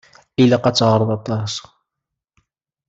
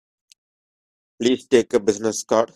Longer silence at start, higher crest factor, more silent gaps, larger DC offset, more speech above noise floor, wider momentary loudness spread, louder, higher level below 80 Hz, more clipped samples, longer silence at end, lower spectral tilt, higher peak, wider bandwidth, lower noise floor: second, 0.4 s vs 1.2 s; about the same, 18 dB vs 20 dB; neither; neither; second, 66 dB vs over 71 dB; first, 13 LU vs 6 LU; first, -17 LUFS vs -20 LUFS; first, -56 dBFS vs -62 dBFS; neither; first, 1.3 s vs 0.1 s; first, -6 dB/octave vs -4 dB/octave; about the same, -2 dBFS vs -2 dBFS; second, 8 kHz vs 13.5 kHz; second, -82 dBFS vs under -90 dBFS